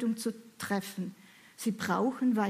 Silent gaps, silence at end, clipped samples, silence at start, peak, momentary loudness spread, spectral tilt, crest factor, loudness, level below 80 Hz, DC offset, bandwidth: none; 0 s; under 0.1%; 0 s; -16 dBFS; 13 LU; -5 dB/octave; 18 dB; -34 LUFS; -76 dBFS; under 0.1%; 15.5 kHz